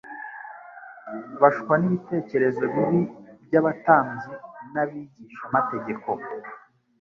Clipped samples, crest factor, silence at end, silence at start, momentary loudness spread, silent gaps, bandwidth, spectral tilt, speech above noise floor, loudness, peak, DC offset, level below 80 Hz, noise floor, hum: under 0.1%; 22 dB; 0.45 s; 0.05 s; 21 LU; none; 6.8 kHz; -10 dB/octave; 20 dB; -23 LUFS; -2 dBFS; under 0.1%; -66 dBFS; -44 dBFS; none